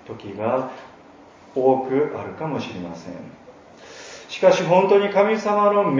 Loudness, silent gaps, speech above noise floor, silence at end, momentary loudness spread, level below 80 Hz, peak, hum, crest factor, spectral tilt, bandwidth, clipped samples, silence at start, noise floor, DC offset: -20 LUFS; none; 27 dB; 0 s; 22 LU; -62 dBFS; -2 dBFS; none; 18 dB; -6 dB/octave; 7.6 kHz; under 0.1%; 0.05 s; -47 dBFS; under 0.1%